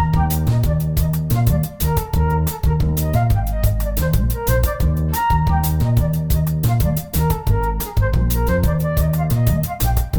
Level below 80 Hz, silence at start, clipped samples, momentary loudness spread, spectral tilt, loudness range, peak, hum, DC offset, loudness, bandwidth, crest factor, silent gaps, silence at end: -22 dBFS; 0 s; under 0.1%; 2 LU; -6.5 dB/octave; 1 LU; -4 dBFS; none; under 0.1%; -19 LUFS; over 20 kHz; 12 dB; none; 0 s